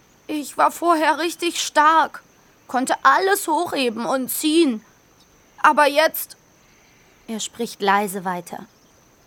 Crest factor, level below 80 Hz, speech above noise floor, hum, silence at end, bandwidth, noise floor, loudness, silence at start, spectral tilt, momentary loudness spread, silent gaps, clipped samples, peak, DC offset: 20 dB; -68 dBFS; 35 dB; none; 0.6 s; over 20 kHz; -54 dBFS; -19 LUFS; 0.3 s; -2.5 dB/octave; 14 LU; none; under 0.1%; 0 dBFS; under 0.1%